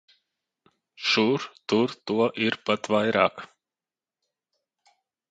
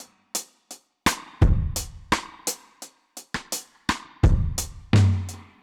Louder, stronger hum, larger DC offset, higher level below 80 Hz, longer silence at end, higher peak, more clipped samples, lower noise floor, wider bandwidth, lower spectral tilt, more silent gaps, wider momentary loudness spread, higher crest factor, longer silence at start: about the same, -25 LUFS vs -25 LUFS; neither; neither; second, -68 dBFS vs -30 dBFS; first, 1.85 s vs 0.2 s; about the same, -4 dBFS vs -6 dBFS; neither; first, under -90 dBFS vs -48 dBFS; second, 9 kHz vs 19 kHz; about the same, -5 dB/octave vs -4.5 dB/octave; neither; second, 6 LU vs 20 LU; first, 24 dB vs 18 dB; first, 1 s vs 0 s